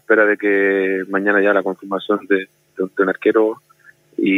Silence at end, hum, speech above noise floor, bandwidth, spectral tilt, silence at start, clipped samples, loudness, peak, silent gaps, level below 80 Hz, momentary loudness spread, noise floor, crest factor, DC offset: 0 s; none; 34 dB; 10.5 kHz; -7 dB/octave; 0.1 s; under 0.1%; -17 LUFS; 0 dBFS; none; -80 dBFS; 11 LU; -51 dBFS; 16 dB; under 0.1%